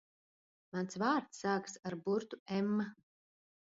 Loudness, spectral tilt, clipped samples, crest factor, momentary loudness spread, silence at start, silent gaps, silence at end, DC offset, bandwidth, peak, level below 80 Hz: -38 LUFS; -5 dB/octave; under 0.1%; 18 dB; 9 LU; 0.75 s; 2.39-2.46 s; 0.85 s; under 0.1%; 7.6 kHz; -20 dBFS; -80 dBFS